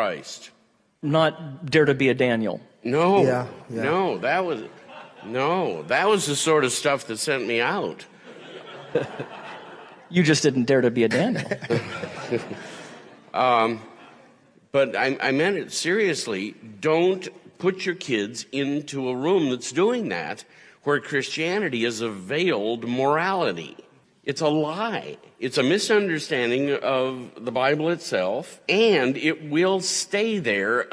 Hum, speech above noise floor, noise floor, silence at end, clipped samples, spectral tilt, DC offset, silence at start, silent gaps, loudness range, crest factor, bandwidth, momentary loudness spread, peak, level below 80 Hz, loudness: none; 32 dB; -55 dBFS; 0 s; under 0.1%; -4.5 dB/octave; under 0.1%; 0 s; none; 3 LU; 18 dB; 11 kHz; 15 LU; -6 dBFS; -70 dBFS; -23 LUFS